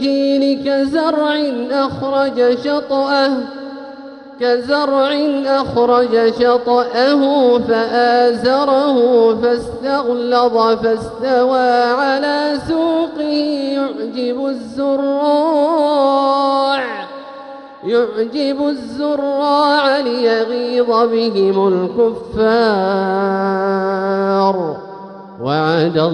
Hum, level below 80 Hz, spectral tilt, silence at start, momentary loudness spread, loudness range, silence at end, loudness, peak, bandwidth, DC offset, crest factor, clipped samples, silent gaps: none; -50 dBFS; -6.5 dB/octave; 0 s; 8 LU; 4 LU; 0 s; -15 LUFS; -2 dBFS; 10.5 kHz; under 0.1%; 14 dB; under 0.1%; none